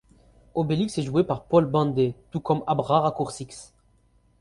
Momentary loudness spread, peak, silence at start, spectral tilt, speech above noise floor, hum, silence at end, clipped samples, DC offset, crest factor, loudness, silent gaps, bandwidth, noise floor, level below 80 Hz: 11 LU; -6 dBFS; 0.55 s; -7 dB/octave; 38 dB; none; 0.75 s; under 0.1%; under 0.1%; 20 dB; -24 LUFS; none; 11.5 kHz; -62 dBFS; -54 dBFS